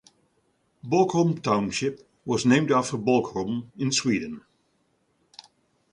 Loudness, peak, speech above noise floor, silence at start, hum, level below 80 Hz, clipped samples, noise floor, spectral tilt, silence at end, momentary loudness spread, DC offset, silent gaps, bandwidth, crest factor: -24 LUFS; -8 dBFS; 46 dB; 0.85 s; none; -62 dBFS; under 0.1%; -69 dBFS; -5 dB/octave; 1.55 s; 12 LU; under 0.1%; none; 11 kHz; 18 dB